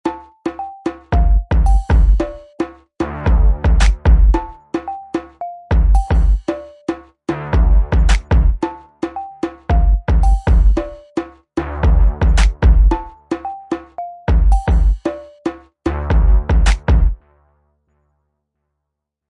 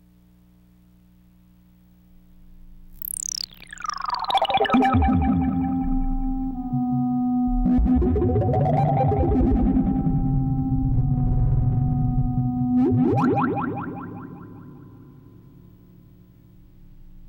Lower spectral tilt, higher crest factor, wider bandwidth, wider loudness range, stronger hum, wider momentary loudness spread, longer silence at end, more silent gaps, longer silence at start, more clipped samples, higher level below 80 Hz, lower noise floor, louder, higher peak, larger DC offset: about the same, -7 dB/octave vs -6.5 dB/octave; about the same, 14 dB vs 14 dB; second, 9.6 kHz vs 16.5 kHz; second, 3 LU vs 13 LU; second, none vs 60 Hz at -45 dBFS; about the same, 12 LU vs 12 LU; first, 2.15 s vs 0 s; neither; second, 0.05 s vs 2.5 s; neither; first, -16 dBFS vs -30 dBFS; first, -78 dBFS vs -54 dBFS; first, -18 LUFS vs -22 LUFS; first, 0 dBFS vs -8 dBFS; neither